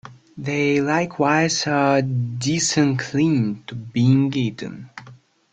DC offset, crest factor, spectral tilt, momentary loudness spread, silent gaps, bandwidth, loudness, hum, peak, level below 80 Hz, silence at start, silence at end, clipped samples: under 0.1%; 18 dB; -5 dB/octave; 14 LU; none; 9.4 kHz; -20 LUFS; none; -4 dBFS; -58 dBFS; 0.05 s; 0.4 s; under 0.1%